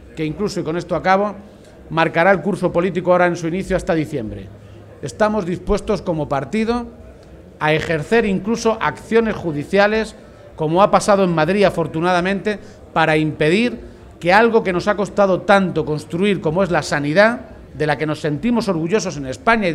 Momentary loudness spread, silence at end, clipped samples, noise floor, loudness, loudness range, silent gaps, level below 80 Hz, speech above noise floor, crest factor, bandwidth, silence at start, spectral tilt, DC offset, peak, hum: 10 LU; 0 s; under 0.1%; -41 dBFS; -18 LUFS; 4 LU; none; -42 dBFS; 23 dB; 18 dB; 13 kHz; 0 s; -6 dB/octave; under 0.1%; 0 dBFS; none